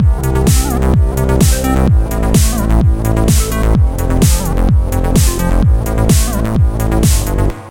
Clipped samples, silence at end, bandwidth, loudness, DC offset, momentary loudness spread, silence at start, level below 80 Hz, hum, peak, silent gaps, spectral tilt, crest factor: under 0.1%; 0 s; 17 kHz; -13 LUFS; under 0.1%; 2 LU; 0 s; -14 dBFS; none; 0 dBFS; none; -5.5 dB/octave; 10 dB